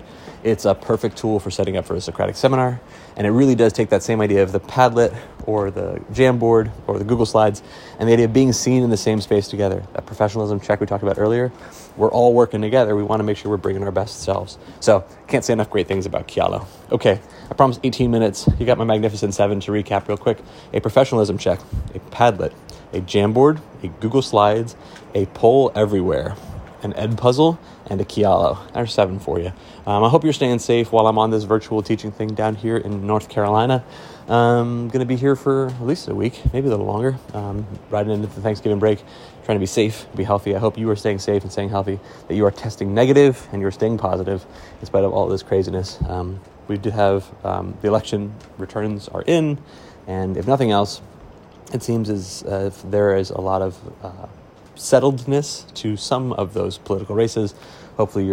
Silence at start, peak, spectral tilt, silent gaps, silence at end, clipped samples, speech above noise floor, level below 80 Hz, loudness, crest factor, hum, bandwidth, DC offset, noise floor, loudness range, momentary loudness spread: 0 s; 0 dBFS; -6.5 dB/octave; none; 0 s; under 0.1%; 24 dB; -42 dBFS; -19 LUFS; 18 dB; none; 16 kHz; under 0.1%; -42 dBFS; 4 LU; 13 LU